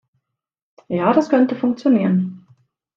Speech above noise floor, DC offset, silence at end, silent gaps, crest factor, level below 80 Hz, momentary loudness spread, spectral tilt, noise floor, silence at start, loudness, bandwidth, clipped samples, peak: 66 dB; under 0.1%; 0.6 s; none; 18 dB; -66 dBFS; 8 LU; -8.5 dB/octave; -83 dBFS; 0.9 s; -18 LUFS; 7.4 kHz; under 0.1%; -2 dBFS